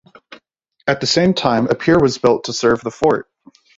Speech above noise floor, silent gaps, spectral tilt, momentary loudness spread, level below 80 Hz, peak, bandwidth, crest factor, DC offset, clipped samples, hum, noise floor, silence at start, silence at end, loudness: 44 dB; none; -5 dB/octave; 6 LU; -48 dBFS; 0 dBFS; 8 kHz; 16 dB; under 0.1%; under 0.1%; none; -60 dBFS; 0.3 s; 0.55 s; -16 LUFS